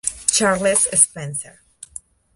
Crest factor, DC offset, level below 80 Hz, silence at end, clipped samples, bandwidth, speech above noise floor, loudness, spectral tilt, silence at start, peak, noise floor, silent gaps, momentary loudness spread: 20 dB; under 0.1%; -52 dBFS; 0.85 s; under 0.1%; 12 kHz; 23 dB; -16 LUFS; -2 dB/octave; 0.05 s; 0 dBFS; -42 dBFS; none; 22 LU